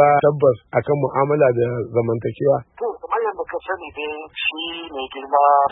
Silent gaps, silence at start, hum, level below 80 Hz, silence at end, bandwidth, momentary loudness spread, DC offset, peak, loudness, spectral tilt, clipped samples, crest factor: none; 0 s; none; -56 dBFS; 0 s; 3.9 kHz; 13 LU; under 0.1%; -2 dBFS; -20 LUFS; -11 dB/octave; under 0.1%; 16 dB